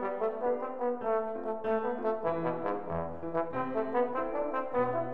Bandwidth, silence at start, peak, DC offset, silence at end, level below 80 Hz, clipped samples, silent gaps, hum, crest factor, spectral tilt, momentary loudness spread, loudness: 4.7 kHz; 0 s; -16 dBFS; 0.6%; 0 s; -62 dBFS; under 0.1%; none; none; 16 dB; -9.5 dB/octave; 4 LU; -33 LUFS